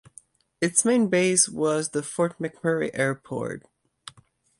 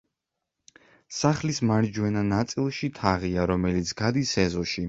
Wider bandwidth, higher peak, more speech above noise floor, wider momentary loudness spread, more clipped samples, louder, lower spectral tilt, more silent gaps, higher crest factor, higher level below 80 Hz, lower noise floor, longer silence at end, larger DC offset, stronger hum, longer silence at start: first, 11.5 kHz vs 8 kHz; about the same, -4 dBFS vs -4 dBFS; second, 34 dB vs 59 dB; first, 17 LU vs 3 LU; neither; about the same, -24 LUFS vs -26 LUFS; second, -3.5 dB/octave vs -5.5 dB/octave; neither; about the same, 22 dB vs 22 dB; second, -66 dBFS vs -46 dBFS; second, -59 dBFS vs -84 dBFS; first, 1 s vs 0 s; neither; neither; second, 0.6 s vs 1.1 s